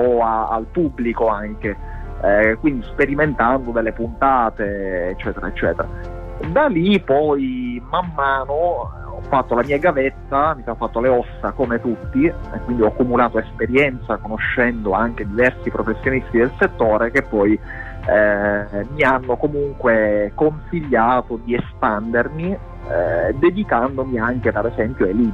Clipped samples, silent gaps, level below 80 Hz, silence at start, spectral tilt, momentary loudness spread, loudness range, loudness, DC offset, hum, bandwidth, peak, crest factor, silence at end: under 0.1%; none; -34 dBFS; 0 s; -8.5 dB/octave; 9 LU; 2 LU; -19 LUFS; under 0.1%; none; 8 kHz; -4 dBFS; 14 dB; 0 s